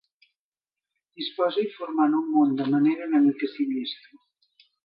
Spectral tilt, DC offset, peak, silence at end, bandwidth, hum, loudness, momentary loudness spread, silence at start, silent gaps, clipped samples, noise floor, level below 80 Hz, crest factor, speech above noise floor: -9 dB/octave; under 0.1%; -10 dBFS; 0.9 s; 5.2 kHz; none; -24 LUFS; 12 LU; 1.2 s; none; under 0.1%; under -90 dBFS; -82 dBFS; 16 dB; over 66 dB